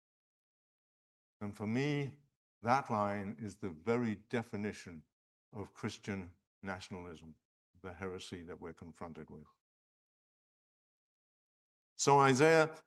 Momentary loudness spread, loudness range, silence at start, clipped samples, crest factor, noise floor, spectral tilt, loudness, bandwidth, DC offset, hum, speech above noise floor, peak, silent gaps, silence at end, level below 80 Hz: 24 LU; 14 LU; 1.4 s; under 0.1%; 24 dB; under -90 dBFS; -5 dB/octave; -35 LUFS; 12 kHz; under 0.1%; none; over 54 dB; -14 dBFS; 2.36-2.61 s, 5.12-5.52 s, 6.47-6.62 s, 7.45-7.74 s, 9.60-11.96 s; 0.05 s; -78 dBFS